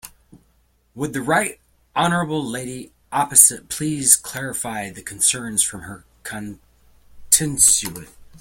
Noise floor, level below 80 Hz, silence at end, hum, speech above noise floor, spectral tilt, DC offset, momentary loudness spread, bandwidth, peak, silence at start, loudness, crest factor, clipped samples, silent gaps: -61 dBFS; -52 dBFS; 0.05 s; none; 40 dB; -2 dB/octave; under 0.1%; 20 LU; 17 kHz; 0 dBFS; 0.05 s; -17 LUFS; 22 dB; under 0.1%; none